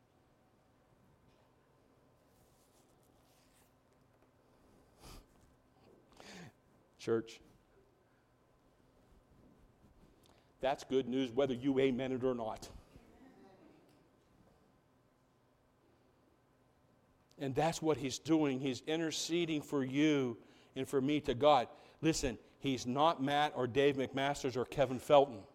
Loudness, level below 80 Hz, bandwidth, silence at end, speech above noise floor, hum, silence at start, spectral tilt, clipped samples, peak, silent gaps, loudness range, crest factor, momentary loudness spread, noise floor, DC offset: -35 LUFS; -64 dBFS; 16 kHz; 0.1 s; 38 dB; none; 5.05 s; -5 dB/octave; under 0.1%; -14 dBFS; none; 13 LU; 24 dB; 19 LU; -72 dBFS; under 0.1%